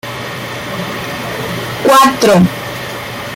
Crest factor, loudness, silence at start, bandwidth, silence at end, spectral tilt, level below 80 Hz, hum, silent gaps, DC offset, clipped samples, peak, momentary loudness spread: 14 dB; -14 LUFS; 0.05 s; 17 kHz; 0 s; -4.5 dB/octave; -44 dBFS; none; none; under 0.1%; under 0.1%; 0 dBFS; 14 LU